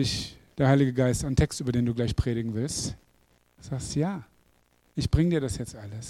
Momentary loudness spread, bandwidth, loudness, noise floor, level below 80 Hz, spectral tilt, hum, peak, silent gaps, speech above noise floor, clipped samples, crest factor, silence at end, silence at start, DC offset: 15 LU; 14 kHz; -27 LUFS; -65 dBFS; -40 dBFS; -6 dB/octave; none; -8 dBFS; none; 38 dB; under 0.1%; 20 dB; 0 s; 0 s; under 0.1%